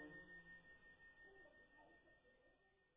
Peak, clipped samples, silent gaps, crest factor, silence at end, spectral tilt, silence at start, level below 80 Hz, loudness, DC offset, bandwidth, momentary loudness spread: -48 dBFS; under 0.1%; none; 18 dB; 0 s; -3.5 dB/octave; 0 s; -82 dBFS; -64 LUFS; under 0.1%; 4 kHz; 9 LU